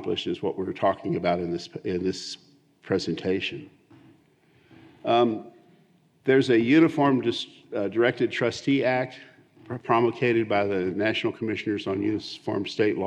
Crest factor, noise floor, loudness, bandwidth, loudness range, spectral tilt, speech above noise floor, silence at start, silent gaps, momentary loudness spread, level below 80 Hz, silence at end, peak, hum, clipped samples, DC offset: 18 dB; -61 dBFS; -25 LUFS; 9.4 kHz; 7 LU; -6 dB/octave; 36 dB; 0 s; none; 13 LU; -72 dBFS; 0 s; -8 dBFS; none; under 0.1%; under 0.1%